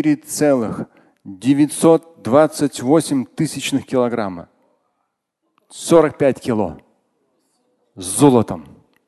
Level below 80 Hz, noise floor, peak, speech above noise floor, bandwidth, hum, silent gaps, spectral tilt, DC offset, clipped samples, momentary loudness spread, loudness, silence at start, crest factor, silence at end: -52 dBFS; -73 dBFS; 0 dBFS; 56 dB; 12.5 kHz; none; none; -5.5 dB/octave; under 0.1%; under 0.1%; 15 LU; -17 LUFS; 0 s; 18 dB; 0.45 s